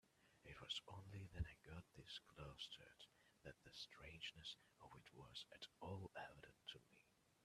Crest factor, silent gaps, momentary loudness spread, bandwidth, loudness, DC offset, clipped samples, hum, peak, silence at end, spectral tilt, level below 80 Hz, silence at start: 22 dB; none; 13 LU; 13 kHz; -57 LUFS; under 0.1%; under 0.1%; none; -36 dBFS; 0 s; -4 dB/octave; -68 dBFS; 0.05 s